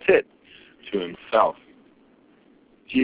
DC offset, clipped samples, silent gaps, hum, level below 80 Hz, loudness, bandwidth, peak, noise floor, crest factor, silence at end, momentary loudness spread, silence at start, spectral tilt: under 0.1%; under 0.1%; none; none; -62 dBFS; -24 LUFS; 4 kHz; -4 dBFS; -57 dBFS; 22 dB; 0 s; 22 LU; 0.05 s; -9 dB/octave